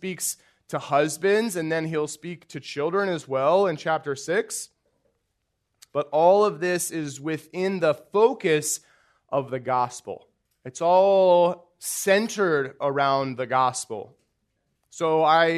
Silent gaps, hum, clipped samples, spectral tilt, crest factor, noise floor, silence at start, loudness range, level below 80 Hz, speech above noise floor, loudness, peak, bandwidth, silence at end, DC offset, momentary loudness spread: none; none; under 0.1%; -4 dB/octave; 18 dB; -76 dBFS; 0.05 s; 4 LU; -74 dBFS; 53 dB; -23 LUFS; -6 dBFS; 13.5 kHz; 0 s; under 0.1%; 15 LU